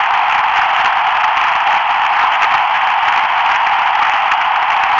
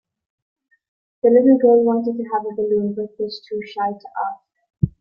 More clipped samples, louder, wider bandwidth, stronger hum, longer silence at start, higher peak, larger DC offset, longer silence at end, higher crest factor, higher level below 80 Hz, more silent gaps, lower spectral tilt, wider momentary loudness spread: neither; first, -12 LUFS vs -19 LUFS; first, 7.6 kHz vs 5.6 kHz; neither; second, 0 s vs 1.25 s; about the same, -2 dBFS vs -2 dBFS; neither; about the same, 0 s vs 0.1 s; second, 10 dB vs 18 dB; about the same, -52 dBFS vs -52 dBFS; neither; second, -1 dB/octave vs -10 dB/octave; second, 1 LU vs 15 LU